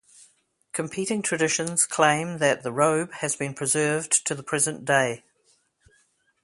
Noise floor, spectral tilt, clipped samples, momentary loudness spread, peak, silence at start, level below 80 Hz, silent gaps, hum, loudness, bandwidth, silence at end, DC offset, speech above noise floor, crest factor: -66 dBFS; -3 dB/octave; under 0.1%; 7 LU; -4 dBFS; 0.75 s; -68 dBFS; none; none; -24 LUFS; 12 kHz; 1.25 s; under 0.1%; 42 dB; 22 dB